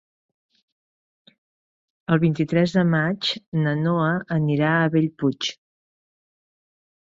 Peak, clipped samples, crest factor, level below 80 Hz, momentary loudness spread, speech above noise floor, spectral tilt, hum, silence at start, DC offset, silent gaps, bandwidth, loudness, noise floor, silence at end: -6 dBFS; under 0.1%; 18 dB; -62 dBFS; 5 LU; over 69 dB; -6.5 dB/octave; none; 2.1 s; under 0.1%; 3.46-3.52 s; 7.6 kHz; -22 LUFS; under -90 dBFS; 1.5 s